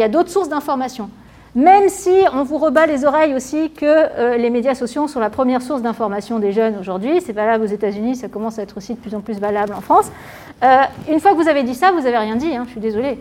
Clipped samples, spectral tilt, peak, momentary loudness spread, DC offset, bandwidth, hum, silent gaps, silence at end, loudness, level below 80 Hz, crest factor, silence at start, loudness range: under 0.1%; -5 dB/octave; 0 dBFS; 12 LU; under 0.1%; 16.5 kHz; none; none; 0 s; -16 LUFS; -52 dBFS; 16 dB; 0 s; 5 LU